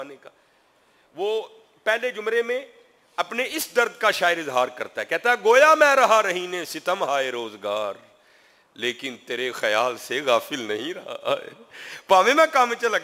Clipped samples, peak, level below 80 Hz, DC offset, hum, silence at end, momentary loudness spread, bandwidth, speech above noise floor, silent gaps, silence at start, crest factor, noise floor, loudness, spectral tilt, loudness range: under 0.1%; -2 dBFS; -74 dBFS; under 0.1%; none; 0 s; 15 LU; 16 kHz; 38 dB; none; 0 s; 20 dB; -61 dBFS; -22 LUFS; -2 dB/octave; 8 LU